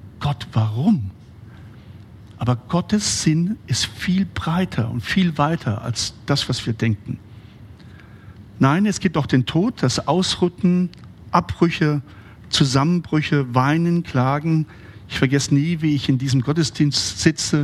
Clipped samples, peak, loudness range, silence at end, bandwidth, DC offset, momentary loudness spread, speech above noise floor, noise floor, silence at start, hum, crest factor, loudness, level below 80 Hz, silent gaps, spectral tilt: under 0.1%; -2 dBFS; 3 LU; 0 s; 13 kHz; under 0.1%; 6 LU; 23 dB; -42 dBFS; 0.05 s; none; 20 dB; -20 LUFS; -48 dBFS; none; -5 dB/octave